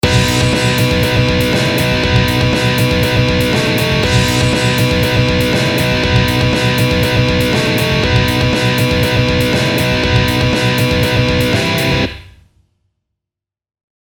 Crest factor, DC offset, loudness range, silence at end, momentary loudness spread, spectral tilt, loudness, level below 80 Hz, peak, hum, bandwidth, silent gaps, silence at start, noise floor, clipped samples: 14 dB; under 0.1%; 2 LU; 1.8 s; 1 LU; -5 dB/octave; -13 LUFS; -26 dBFS; 0 dBFS; none; 19.5 kHz; none; 0.05 s; -85 dBFS; under 0.1%